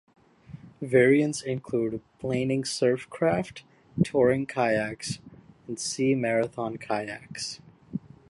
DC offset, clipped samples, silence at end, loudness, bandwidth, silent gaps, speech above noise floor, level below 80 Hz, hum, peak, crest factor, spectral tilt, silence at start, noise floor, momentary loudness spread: under 0.1%; under 0.1%; 0.3 s; -27 LUFS; 11.5 kHz; none; 21 dB; -60 dBFS; none; -8 dBFS; 20 dB; -5.5 dB/octave; 0.5 s; -47 dBFS; 17 LU